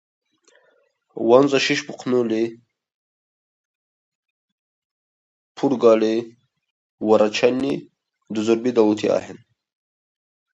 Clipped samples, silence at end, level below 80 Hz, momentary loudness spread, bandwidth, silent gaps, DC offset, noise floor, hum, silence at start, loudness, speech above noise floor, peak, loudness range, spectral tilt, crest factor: under 0.1%; 1.15 s; -68 dBFS; 12 LU; 8 kHz; 2.94-4.23 s, 4.30-5.55 s, 6.70-6.98 s; under 0.1%; -63 dBFS; none; 1.15 s; -20 LUFS; 44 dB; 0 dBFS; 8 LU; -5 dB/octave; 22 dB